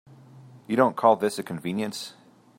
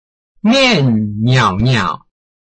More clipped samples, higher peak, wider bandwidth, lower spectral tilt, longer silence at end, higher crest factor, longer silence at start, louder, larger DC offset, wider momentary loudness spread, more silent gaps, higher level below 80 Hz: neither; about the same, -4 dBFS vs -2 dBFS; first, 16.5 kHz vs 8.6 kHz; about the same, -5.5 dB/octave vs -5.5 dB/octave; about the same, 0.5 s vs 0.45 s; first, 22 dB vs 12 dB; about the same, 0.35 s vs 0.45 s; second, -25 LUFS vs -13 LUFS; neither; first, 14 LU vs 9 LU; neither; second, -74 dBFS vs -40 dBFS